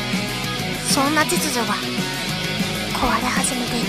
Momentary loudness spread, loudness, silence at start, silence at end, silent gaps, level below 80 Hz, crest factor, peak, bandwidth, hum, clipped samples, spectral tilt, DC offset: 6 LU; -20 LUFS; 0 s; 0 s; none; -42 dBFS; 18 dB; -2 dBFS; 15.5 kHz; none; under 0.1%; -3 dB/octave; under 0.1%